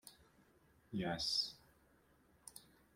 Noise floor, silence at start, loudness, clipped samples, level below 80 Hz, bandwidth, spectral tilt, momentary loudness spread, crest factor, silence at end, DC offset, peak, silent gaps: -72 dBFS; 0.05 s; -40 LUFS; under 0.1%; -72 dBFS; 16.5 kHz; -3.5 dB/octave; 23 LU; 20 dB; 0.35 s; under 0.1%; -26 dBFS; none